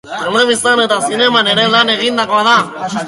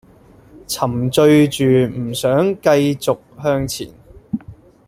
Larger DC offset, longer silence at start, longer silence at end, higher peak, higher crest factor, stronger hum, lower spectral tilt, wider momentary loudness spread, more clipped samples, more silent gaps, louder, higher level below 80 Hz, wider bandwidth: neither; second, 0.05 s vs 0.7 s; second, 0 s vs 0.35 s; about the same, 0 dBFS vs -2 dBFS; about the same, 12 dB vs 16 dB; neither; second, -2.5 dB/octave vs -6 dB/octave; second, 4 LU vs 16 LU; neither; neither; first, -11 LUFS vs -16 LUFS; second, -58 dBFS vs -48 dBFS; second, 11.5 kHz vs 16 kHz